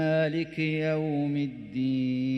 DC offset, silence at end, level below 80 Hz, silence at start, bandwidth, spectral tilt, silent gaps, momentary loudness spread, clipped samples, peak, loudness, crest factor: under 0.1%; 0 s; -64 dBFS; 0 s; 6.2 kHz; -8.5 dB/octave; none; 5 LU; under 0.1%; -16 dBFS; -29 LUFS; 12 dB